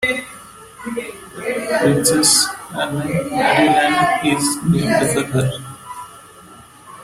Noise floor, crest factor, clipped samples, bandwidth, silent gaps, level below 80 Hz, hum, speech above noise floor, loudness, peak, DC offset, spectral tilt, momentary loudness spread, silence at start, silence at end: -42 dBFS; 18 dB; under 0.1%; 16.5 kHz; none; -50 dBFS; none; 26 dB; -17 LUFS; 0 dBFS; under 0.1%; -3.5 dB/octave; 20 LU; 0 s; 0 s